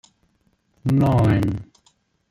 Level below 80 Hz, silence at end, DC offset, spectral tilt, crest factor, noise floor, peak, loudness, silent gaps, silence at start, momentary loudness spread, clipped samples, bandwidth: -42 dBFS; 0.65 s; under 0.1%; -9 dB/octave; 16 dB; -65 dBFS; -6 dBFS; -20 LUFS; none; 0.85 s; 12 LU; under 0.1%; 14.5 kHz